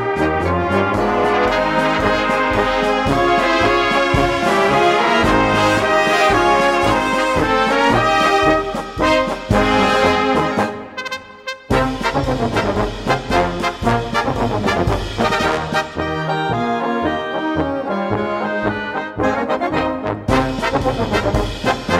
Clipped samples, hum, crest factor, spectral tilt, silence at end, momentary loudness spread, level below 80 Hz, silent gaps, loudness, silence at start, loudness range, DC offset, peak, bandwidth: under 0.1%; none; 16 dB; -5 dB/octave; 0 s; 7 LU; -32 dBFS; none; -17 LUFS; 0 s; 6 LU; under 0.1%; -2 dBFS; 16 kHz